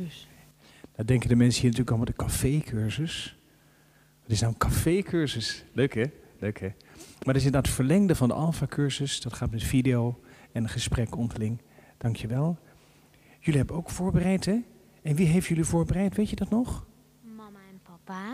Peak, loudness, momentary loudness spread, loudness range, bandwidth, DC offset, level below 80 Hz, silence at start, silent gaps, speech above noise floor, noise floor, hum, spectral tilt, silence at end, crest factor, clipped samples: -10 dBFS; -27 LUFS; 15 LU; 4 LU; 15.5 kHz; under 0.1%; -44 dBFS; 0 s; none; 34 dB; -60 dBFS; none; -6 dB/octave; 0 s; 18 dB; under 0.1%